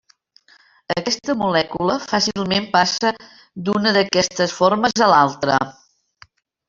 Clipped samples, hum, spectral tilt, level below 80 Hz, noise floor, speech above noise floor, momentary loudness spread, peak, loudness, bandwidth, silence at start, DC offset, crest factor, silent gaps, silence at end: under 0.1%; none; -3.5 dB/octave; -56 dBFS; -54 dBFS; 36 dB; 9 LU; -2 dBFS; -18 LUFS; 7.6 kHz; 0.9 s; under 0.1%; 18 dB; none; 1 s